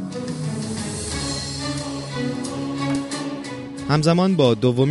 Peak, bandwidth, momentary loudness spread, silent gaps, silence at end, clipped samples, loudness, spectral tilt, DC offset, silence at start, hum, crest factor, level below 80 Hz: -4 dBFS; 11.5 kHz; 11 LU; none; 0 s; under 0.1%; -23 LUFS; -5.5 dB/octave; under 0.1%; 0 s; none; 18 dB; -44 dBFS